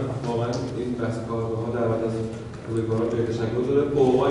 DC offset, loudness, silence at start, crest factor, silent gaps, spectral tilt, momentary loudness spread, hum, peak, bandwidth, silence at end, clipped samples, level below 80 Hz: under 0.1%; -25 LUFS; 0 s; 16 dB; none; -7.5 dB/octave; 9 LU; none; -8 dBFS; 11 kHz; 0 s; under 0.1%; -48 dBFS